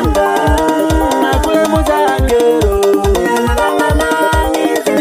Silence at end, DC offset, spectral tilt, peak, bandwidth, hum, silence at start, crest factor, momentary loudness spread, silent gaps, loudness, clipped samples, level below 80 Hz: 0 s; under 0.1%; -5.5 dB/octave; 0 dBFS; 16 kHz; none; 0 s; 12 dB; 2 LU; none; -12 LUFS; under 0.1%; -20 dBFS